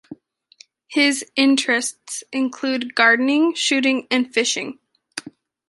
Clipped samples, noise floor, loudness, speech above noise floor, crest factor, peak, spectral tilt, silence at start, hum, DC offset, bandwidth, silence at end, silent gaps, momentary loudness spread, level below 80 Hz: under 0.1%; -52 dBFS; -19 LUFS; 33 dB; 20 dB; -2 dBFS; -1 dB/octave; 0.1 s; none; under 0.1%; 11.5 kHz; 0.4 s; none; 17 LU; -74 dBFS